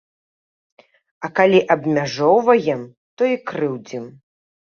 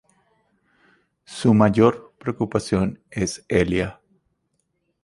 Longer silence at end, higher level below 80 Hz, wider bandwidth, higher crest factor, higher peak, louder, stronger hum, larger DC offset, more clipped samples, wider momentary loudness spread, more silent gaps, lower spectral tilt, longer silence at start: second, 0.7 s vs 1.1 s; second, -64 dBFS vs -46 dBFS; second, 6.8 kHz vs 11.5 kHz; about the same, 18 dB vs 22 dB; about the same, -2 dBFS vs -2 dBFS; first, -18 LUFS vs -21 LUFS; neither; neither; neither; first, 18 LU vs 14 LU; first, 2.97-3.17 s vs none; about the same, -6 dB/octave vs -6.5 dB/octave; about the same, 1.2 s vs 1.3 s